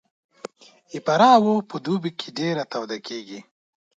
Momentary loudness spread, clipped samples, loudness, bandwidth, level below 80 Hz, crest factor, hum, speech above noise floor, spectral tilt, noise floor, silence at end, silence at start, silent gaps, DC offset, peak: 26 LU; under 0.1%; -21 LUFS; 7.8 kHz; -72 dBFS; 22 dB; none; 20 dB; -5.5 dB/octave; -42 dBFS; 0.55 s; 0.95 s; none; under 0.1%; -2 dBFS